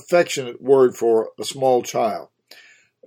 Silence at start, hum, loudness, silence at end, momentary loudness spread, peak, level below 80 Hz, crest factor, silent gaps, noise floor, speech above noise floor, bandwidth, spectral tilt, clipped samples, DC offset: 0.1 s; none; -19 LUFS; 0.85 s; 9 LU; -4 dBFS; -72 dBFS; 16 dB; none; -51 dBFS; 32 dB; 17.5 kHz; -4.5 dB/octave; under 0.1%; under 0.1%